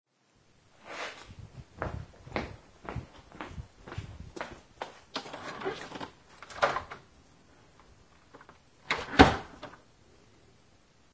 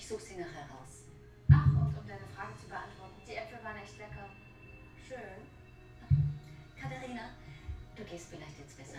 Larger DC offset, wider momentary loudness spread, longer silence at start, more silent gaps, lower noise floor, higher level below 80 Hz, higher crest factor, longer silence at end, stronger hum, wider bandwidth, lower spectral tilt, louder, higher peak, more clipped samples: neither; about the same, 22 LU vs 23 LU; first, 0.85 s vs 0 s; neither; first, -67 dBFS vs -54 dBFS; about the same, -48 dBFS vs -50 dBFS; first, 34 dB vs 26 dB; first, 1.4 s vs 0 s; neither; second, 8 kHz vs 10.5 kHz; second, -5 dB/octave vs -7.5 dB/octave; about the same, -32 LUFS vs -34 LUFS; first, 0 dBFS vs -10 dBFS; neither